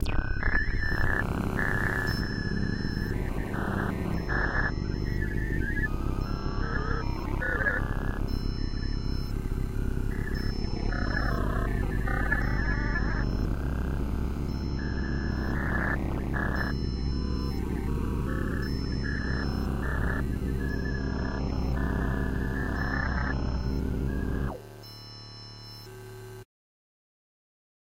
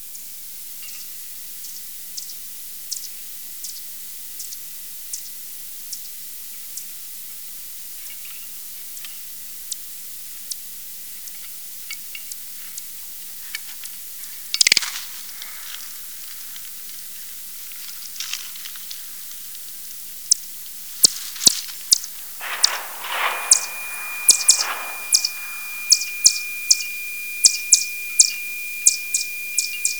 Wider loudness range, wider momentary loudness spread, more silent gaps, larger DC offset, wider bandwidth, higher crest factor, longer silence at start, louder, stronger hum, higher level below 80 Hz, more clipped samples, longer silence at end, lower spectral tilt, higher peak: second, 3 LU vs 14 LU; second, 5 LU vs 16 LU; neither; second, under 0.1% vs 0.6%; second, 16 kHz vs over 20 kHz; second, 18 dB vs 26 dB; about the same, 0 s vs 0 s; second, -31 LUFS vs -22 LUFS; neither; first, -32 dBFS vs -82 dBFS; neither; first, 1.5 s vs 0 s; first, -7 dB/octave vs 3 dB/octave; second, -12 dBFS vs 0 dBFS